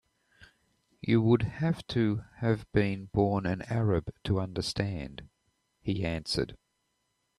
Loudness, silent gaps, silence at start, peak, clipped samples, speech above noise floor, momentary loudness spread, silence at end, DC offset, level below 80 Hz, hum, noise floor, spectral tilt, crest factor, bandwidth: -30 LUFS; none; 0.4 s; -10 dBFS; under 0.1%; 49 dB; 10 LU; 0.85 s; under 0.1%; -52 dBFS; none; -78 dBFS; -7 dB/octave; 20 dB; 12 kHz